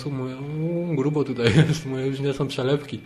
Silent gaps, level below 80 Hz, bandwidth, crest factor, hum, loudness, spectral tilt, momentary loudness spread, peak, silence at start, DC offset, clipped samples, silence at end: none; -52 dBFS; 12 kHz; 20 dB; none; -24 LUFS; -6.5 dB/octave; 10 LU; -4 dBFS; 0 s; under 0.1%; under 0.1%; 0 s